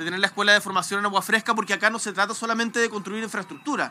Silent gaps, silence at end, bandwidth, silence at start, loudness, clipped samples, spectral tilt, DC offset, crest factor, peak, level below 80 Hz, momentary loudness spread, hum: none; 0 s; 16 kHz; 0 s; -23 LUFS; under 0.1%; -2.5 dB/octave; under 0.1%; 22 dB; -2 dBFS; -88 dBFS; 11 LU; none